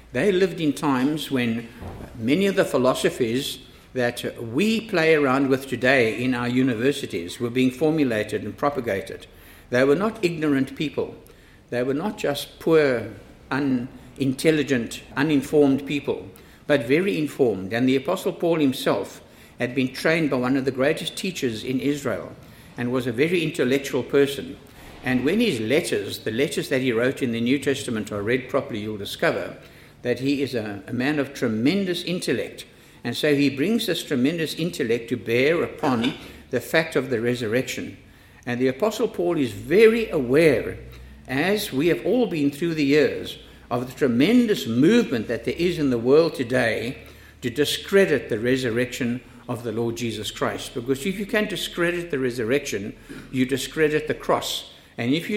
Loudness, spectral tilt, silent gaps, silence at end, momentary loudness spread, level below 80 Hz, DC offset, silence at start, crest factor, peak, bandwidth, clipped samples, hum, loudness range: -23 LUFS; -5.5 dB/octave; none; 0 s; 12 LU; -52 dBFS; under 0.1%; 0.1 s; 20 dB; -2 dBFS; 16.5 kHz; under 0.1%; none; 4 LU